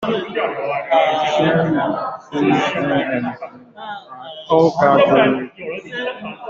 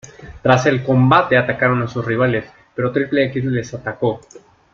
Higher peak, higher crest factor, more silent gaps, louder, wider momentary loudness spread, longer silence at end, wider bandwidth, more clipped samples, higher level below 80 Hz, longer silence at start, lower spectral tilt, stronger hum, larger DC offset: about the same, -2 dBFS vs 0 dBFS; about the same, 16 dB vs 16 dB; neither; about the same, -17 LUFS vs -17 LUFS; first, 19 LU vs 11 LU; second, 0 s vs 0.35 s; about the same, 7.6 kHz vs 7.4 kHz; neither; second, -58 dBFS vs -48 dBFS; about the same, 0 s vs 0.05 s; about the same, -6.5 dB/octave vs -7 dB/octave; neither; neither